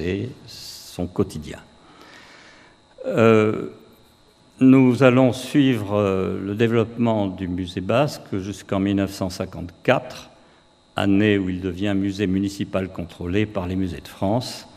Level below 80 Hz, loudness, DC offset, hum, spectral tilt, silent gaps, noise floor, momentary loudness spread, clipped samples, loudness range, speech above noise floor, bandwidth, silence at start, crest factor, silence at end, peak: -52 dBFS; -21 LUFS; under 0.1%; none; -7 dB/octave; none; -55 dBFS; 17 LU; under 0.1%; 6 LU; 34 dB; 14.5 kHz; 0 s; 22 dB; 0.1 s; 0 dBFS